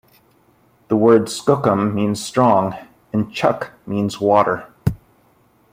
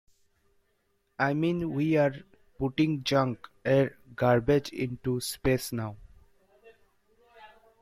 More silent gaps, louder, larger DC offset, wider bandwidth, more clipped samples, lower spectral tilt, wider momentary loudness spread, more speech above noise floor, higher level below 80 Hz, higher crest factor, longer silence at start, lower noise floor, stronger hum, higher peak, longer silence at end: neither; first, -18 LUFS vs -28 LUFS; neither; about the same, 16 kHz vs 16 kHz; neither; about the same, -6.5 dB/octave vs -6 dB/octave; about the same, 11 LU vs 10 LU; second, 39 dB vs 46 dB; first, -48 dBFS vs -54 dBFS; about the same, 18 dB vs 18 dB; second, 0.9 s vs 1.2 s; second, -56 dBFS vs -73 dBFS; neither; first, 0 dBFS vs -12 dBFS; first, 0.75 s vs 0.35 s